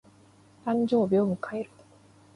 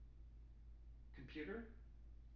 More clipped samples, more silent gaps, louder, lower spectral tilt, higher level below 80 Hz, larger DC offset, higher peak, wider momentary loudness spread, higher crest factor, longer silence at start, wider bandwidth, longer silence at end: neither; neither; first, -27 LUFS vs -57 LUFS; first, -8.5 dB/octave vs -5.5 dB/octave; second, -68 dBFS vs -60 dBFS; neither; first, -14 dBFS vs -36 dBFS; about the same, 14 LU vs 13 LU; about the same, 16 dB vs 20 dB; first, 0.65 s vs 0 s; first, 11 kHz vs 6.6 kHz; first, 0.7 s vs 0 s